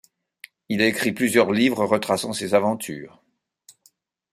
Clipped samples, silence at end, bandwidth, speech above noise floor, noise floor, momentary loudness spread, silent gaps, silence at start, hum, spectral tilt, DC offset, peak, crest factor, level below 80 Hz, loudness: under 0.1%; 1.25 s; 15.5 kHz; 41 dB; -62 dBFS; 11 LU; none; 0.7 s; none; -4.5 dB/octave; under 0.1%; -4 dBFS; 20 dB; -64 dBFS; -21 LUFS